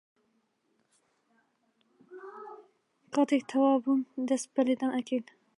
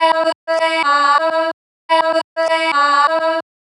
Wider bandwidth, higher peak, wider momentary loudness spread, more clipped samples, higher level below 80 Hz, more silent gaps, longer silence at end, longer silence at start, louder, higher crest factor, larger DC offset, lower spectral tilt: about the same, 11.5 kHz vs 11.5 kHz; second, -14 dBFS vs -2 dBFS; first, 21 LU vs 7 LU; neither; about the same, -88 dBFS vs under -90 dBFS; second, none vs 0.35-0.47 s, 1.53-1.89 s, 2.24-2.36 s; about the same, 0.35 s vs 0.35 s; first, 2.1 s vs 0 s; second, -29 LUFS vs -15 LUFS; about the same, 18 dB vs 14 dB; neither; first, -4 dB/octave vs -0.5 dB/octave